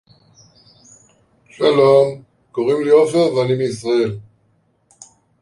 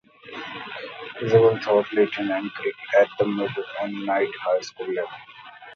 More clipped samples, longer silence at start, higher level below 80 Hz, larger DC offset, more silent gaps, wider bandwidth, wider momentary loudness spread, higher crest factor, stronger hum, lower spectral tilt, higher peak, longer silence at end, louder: neither; first, 1.6 s vs 0.25 s; first, -60 dBFS vs -66 dBFS; neither; neither; first, 11.5 kHz vs 7 kHz; second, 12 LU vs 17 LU; about the same, 16 dB vs 20 dB; neither; about the same, -6 dB/octave vs -6 dB/octave; about the same, -2 dBFS vs -4 dBFS; first, 1.2 s vs 0 s; first, -16 LUFS vs -23 LUFS